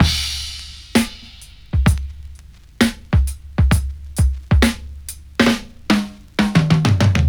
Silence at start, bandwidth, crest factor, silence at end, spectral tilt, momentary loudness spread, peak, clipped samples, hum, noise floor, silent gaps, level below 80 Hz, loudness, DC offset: 0 s; over 20 kHz; 18 dB; 0 s; -5.5 dB/octave; 16 LU; 0 dBFS; under 0.1%; none; -40 dBFS; none; -24 dBFS; -19 LUFS; under 0.1%